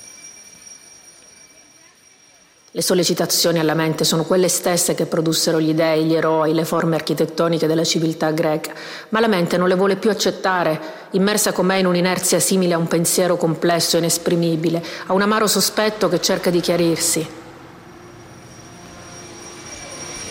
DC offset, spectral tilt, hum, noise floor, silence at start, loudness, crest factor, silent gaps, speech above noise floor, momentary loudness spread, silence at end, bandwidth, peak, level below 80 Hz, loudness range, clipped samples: under 0.1%; -4 dB/octave; none; -51 dBFS; 0 s; -18 LUFS; 14 dB; none; 33 dB; 17 LU; 0 s; 16.5 kHz; -6 dBFS; -58 dBFS; 5 LU; under 0.1%